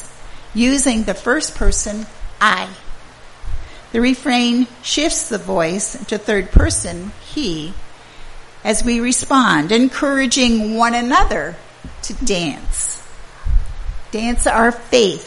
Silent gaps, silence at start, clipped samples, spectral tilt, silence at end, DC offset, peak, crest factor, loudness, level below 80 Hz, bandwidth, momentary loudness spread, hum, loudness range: none; 0 s; under 0.1%; -3.5 dB/octave; 0 s; under 0.1%; 0 dBFS; 18 dB; -17 LUFS; -24 dBFS; 11.5 kHz; 17 LU; none; 5 LU